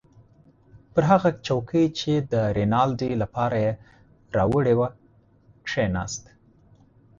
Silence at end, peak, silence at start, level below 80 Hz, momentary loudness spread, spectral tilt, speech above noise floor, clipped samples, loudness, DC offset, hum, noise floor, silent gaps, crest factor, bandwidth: 1 s; -6 dBFS; 0.75 s; -48 dBFS; 9 LU; -6.5 dB/octave; 34 dB; under 0.1%; -24 LUFS; under 0.1%; none; -57 dBFS; none; 18 dB; 7.8 kHz